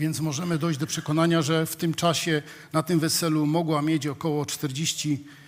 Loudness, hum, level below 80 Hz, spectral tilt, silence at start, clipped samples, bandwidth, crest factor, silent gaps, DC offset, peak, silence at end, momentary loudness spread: -25 LUFS; none; -66 dBFS; -4.5 dB/octave; 0 s; under 0.1%; 16 kHz; 18 dB; none; under 0.1%; -8 dBFS; 0 s; 6 LU